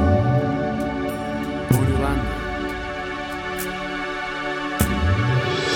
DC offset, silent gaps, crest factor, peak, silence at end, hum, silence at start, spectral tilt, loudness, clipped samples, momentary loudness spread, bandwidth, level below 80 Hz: under 0.1%; none; 20 dB; -2 dBFS; 0 s; none; 0 s; -6 dB/octave; -23 LUFS; under 0.1%; 8 LU; over 20 kHz; -34 dBFS